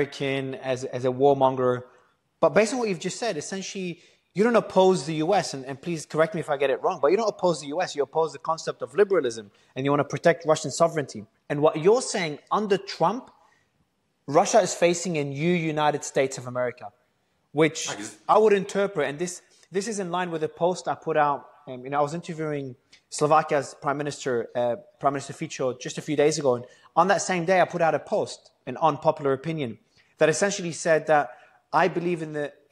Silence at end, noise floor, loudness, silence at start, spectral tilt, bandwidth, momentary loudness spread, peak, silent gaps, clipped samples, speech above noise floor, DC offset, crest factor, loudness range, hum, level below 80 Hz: 0.2 s; -71 dBFS; -25 LUFS; 0 s; -4.5 dB/octave; 12.5 kHz; 12 LU; -6 dBFS; none; under 0.1%; 46 dB; under 0.1%; 18 dB; 3 LU; none; -70 dBFS